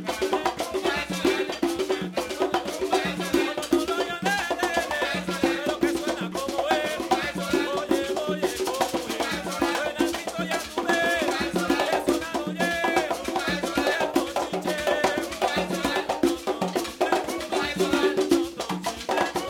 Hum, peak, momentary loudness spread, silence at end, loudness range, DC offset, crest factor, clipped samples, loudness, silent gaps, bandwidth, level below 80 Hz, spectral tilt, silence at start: none; -8 dBFS; 4 LU; 0 s; 1 LU; under 0.1%; 18 dB; under 0.1%; -26 LUFS; none; 18 kHz; -52 dBFS; -3.5 dB/octave; 0 s